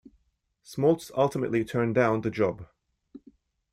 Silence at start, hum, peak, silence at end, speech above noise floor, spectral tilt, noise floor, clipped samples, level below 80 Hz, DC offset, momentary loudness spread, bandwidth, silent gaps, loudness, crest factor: 0.7 s; none; -10 dBFS; 1.1 s; 46 dB; -7 dB/octave; -71 dBFS; under 0.1%; -62 dBFS; under 0.1%; 5 LU; 15 kHz; none; -26 LUFS; 18 dB